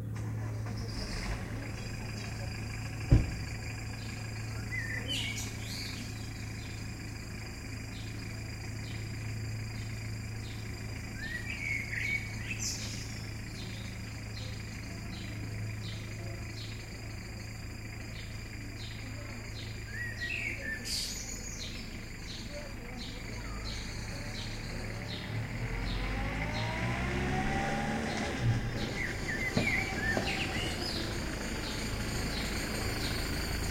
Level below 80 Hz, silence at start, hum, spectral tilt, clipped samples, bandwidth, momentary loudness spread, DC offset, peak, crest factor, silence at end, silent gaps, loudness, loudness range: -44 dBFS; 0 s; none; -4.5 dB/octave; under 0.1%; 16.5 kHz; 10 LU; under 0.1%; -10 dBFS; 26 dB; 0 s; none; -37 LUFS; 8 LU